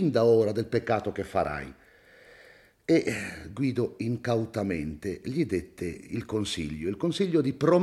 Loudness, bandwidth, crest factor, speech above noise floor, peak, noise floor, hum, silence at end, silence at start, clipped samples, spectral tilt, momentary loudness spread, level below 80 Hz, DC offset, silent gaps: -28 LUFS; 13.5 kHz; 18 dB; 28 dB; -10 dBFS; -56 dBFS; none; 0 s; 0 s; under 0.1%; -6.5 dB/octave; 12 LU; -56 dBFS; under 0.1%; none